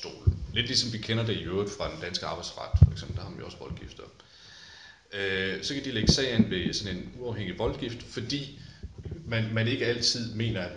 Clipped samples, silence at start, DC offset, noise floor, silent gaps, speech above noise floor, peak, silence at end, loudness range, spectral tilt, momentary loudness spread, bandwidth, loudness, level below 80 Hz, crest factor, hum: under 0.1%; 0 s; under 0.1%; -51 dBFS; none; 22 dB; -4 dBFS; 0 s; 4 LU; -5 dB/octave; 20 LU; 11 kHz; -29 LUFS; -40 dBFS; 24 dB; none